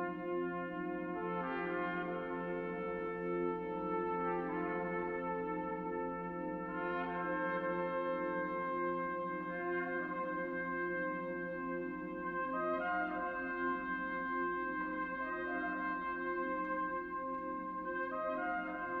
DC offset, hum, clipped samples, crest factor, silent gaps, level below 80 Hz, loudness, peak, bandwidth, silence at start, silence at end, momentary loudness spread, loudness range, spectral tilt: under 0.1%; none; under 0.1%; 14 dB; none; -66 dBFS; -39 LUFS; -24 dBFS; 4.8 kHz; 0 s; 0 s; 4 LU; 1 LU; -9 dB/octave